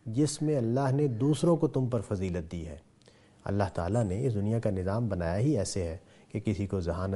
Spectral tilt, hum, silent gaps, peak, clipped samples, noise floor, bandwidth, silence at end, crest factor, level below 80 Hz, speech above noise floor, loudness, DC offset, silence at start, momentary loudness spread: -7 dB/octave; none; none; -12 dBFS; under 0.1%; -59 dBFS; 11.5 kHz; 0 s; 16 dB; -52 dBFS; 30 dB; -30 LUFS; under 0.1%; 0.05 s; 12 LU